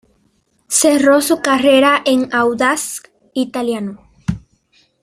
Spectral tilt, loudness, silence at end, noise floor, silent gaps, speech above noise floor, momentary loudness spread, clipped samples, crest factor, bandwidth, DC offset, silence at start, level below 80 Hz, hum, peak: -3.5 dB/octave; -14 LUFS; 0.65 s; -60 dBFS; none; 46 dB; 15 LU; under 0.1%; 16 dB; 15.5 kHz; under 0.1%; 0.7 s; -48 dBFS; none; 0 dBFS